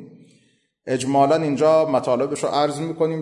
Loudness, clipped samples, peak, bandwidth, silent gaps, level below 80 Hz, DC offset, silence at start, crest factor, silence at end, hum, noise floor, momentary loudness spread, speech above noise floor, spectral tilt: -20 LUFS; under 0.1%; -6 dBFS; 11.5 kHz; none; -66 dBFS; under 0.1%; 0 s; 14 dB; 0 s; none; -62 dBFS; 8 LU; 43 dB; -5.5 dB/octave